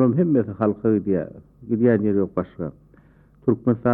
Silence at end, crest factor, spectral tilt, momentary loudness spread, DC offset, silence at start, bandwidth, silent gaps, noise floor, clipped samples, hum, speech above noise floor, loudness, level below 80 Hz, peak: 0 s; 16 dB; -13 dB/octave; 15 LU; under 0.1%; 0 s; 3.5 kHz; none; -53 dBFS; under 0.1%; none; 32 dB; -22 LUFS; -54 dBFS; -6 dBFS